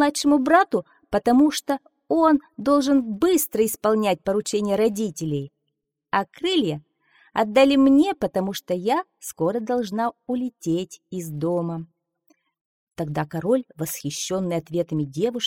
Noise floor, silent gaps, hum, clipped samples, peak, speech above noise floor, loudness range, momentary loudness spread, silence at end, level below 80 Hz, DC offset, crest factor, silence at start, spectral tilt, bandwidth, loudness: -79 dBFS; 12.61-12.87 s; none; under 0.1%; -4 dBFS; 57 dB; 8 LU; 11 LU; 0 s; -58 dBFS; under 0.1%; 18 dB; 0 s; -5 dB/octave; 19 kHz; -22 LUFS